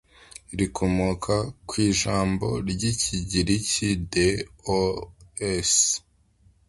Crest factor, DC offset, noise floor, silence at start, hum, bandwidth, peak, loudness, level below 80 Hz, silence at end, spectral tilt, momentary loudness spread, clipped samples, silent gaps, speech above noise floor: 18 dB; under 0.1%; -60 dBFS; 0.5 s; none; 11.5 kHz; -8 dBFS; -24 LUFS; -42 dBFS; 0.7 s; -4 dB/octave; 10 LU; under 0.1%; none; 36 dB